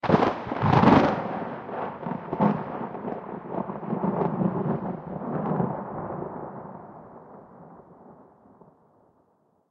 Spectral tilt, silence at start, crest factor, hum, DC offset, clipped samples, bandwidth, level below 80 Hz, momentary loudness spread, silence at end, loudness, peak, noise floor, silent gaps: -8.5 dB/octave; 0.05 s; 24 dB; none; under 0.1%; under 0.1%; 7.2 kHz; -56 dBFS; 22 LU; 1.5 s; -27 LUFS; -4 dBFS; -66 dBFS; none